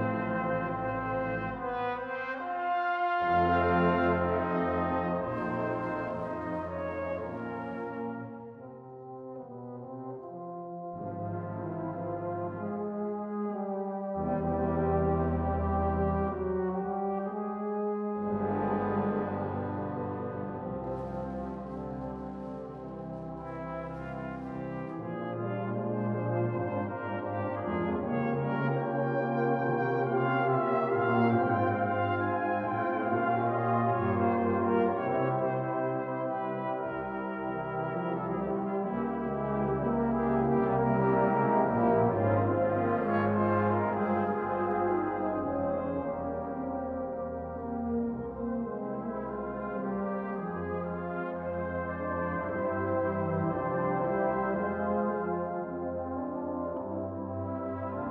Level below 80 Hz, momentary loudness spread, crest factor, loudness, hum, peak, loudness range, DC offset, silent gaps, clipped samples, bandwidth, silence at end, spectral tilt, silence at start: -52 dBFS; 11 LU; 16 dB; -31 LUFS; none; -14 dBFS; 10 LU; under 0.1%; none; under 0.1%; 5.6 kHz; 0 s; -10.5 dB/octave; 0 s